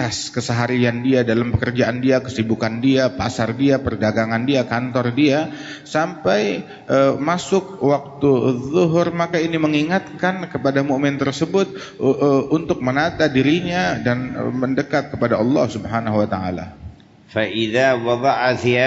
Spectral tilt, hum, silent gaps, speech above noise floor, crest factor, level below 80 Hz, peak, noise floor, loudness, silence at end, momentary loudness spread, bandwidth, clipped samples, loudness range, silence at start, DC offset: -6 dB/octave; none; none; 21 dB; 14 dB; -48 dBFS; -4 dBFS; -39 dBFS; -19 LUFS; 0 s; 5 LU; 8 kHz; under 0.1%; 2 LU; 0 s; under 0.1%